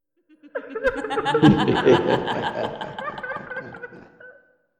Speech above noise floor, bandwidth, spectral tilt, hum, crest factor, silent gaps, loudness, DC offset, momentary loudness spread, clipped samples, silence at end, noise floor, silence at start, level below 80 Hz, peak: 34 dB; 9.6 kHz; -7 dB/octave; none; 20 dB; none; -22 LUFS; under 0.1%; 19 LU; under 0.1%; 0.5 s; -54 dBFS; 0.45 s; -50 dBFS; -2 dBFS